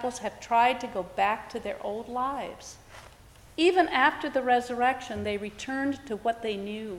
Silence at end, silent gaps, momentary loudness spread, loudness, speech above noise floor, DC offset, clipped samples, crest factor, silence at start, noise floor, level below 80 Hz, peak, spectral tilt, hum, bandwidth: 0 s; none; 13 LU; -28 LUFS; 24 dB; under 0.1%; under 0.1%; 22 dB; 0 s; -53 dBFS; -58 dBFS; -8 dBFS; -4 dB/octave; none; 15.5 kHz